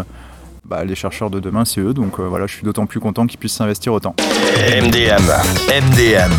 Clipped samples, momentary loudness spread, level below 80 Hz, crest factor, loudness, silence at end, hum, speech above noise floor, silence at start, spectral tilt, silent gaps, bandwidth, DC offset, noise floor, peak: under 0.1%; 11 LU; -32 dBFS; 14 dB; -15 LUFS; 0 s; none; 22 dB; 0 s; -4.5 dB/octave; none; 19 kHz; under 0.1%; -37 dBFS; -2 dBFS